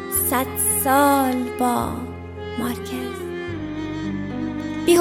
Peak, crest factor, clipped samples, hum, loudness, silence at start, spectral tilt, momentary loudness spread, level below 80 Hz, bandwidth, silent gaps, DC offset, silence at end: -4 dBFS; 18 dB; under 0.1%; none; -22 LUFS; 0 s; -4 dB/octave; 13 LU; -46 dBFS; 16.5 kHz; none; under 0.1%; 0 s